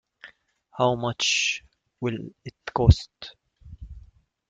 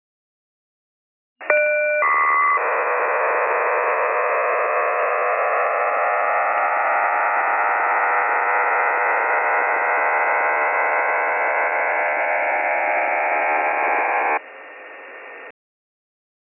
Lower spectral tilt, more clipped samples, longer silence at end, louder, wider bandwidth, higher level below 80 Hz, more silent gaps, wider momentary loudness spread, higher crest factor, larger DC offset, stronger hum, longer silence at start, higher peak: first, -4.5 dB/octave vs -3 dB/octave; neither; second, 0.5 s vs 1 s; second, -24 LUFS vs -19 LUFS; first, 9.2 kHz vs 3 kHz; first, -36 dBFS vs under -90 dBFS; neither; first, 24 LU vs 3 LU; first, 24 dB vs 18 dB; neither; neither; second, 0.25 s vs 1.4 s; about the same, -2 dBFS vs -2 dBFS